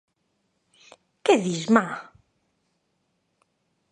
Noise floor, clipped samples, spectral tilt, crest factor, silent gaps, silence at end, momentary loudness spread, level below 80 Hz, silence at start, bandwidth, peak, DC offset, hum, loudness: -73 dBFS; under 0.1%; -5 dB/octave; 26 dB; none; 1.9 s; 12 LU; -72 dBFS; 1.25 s; 10.5 kHz; -2 dBFS; under 0.1%; none; -23 LUFS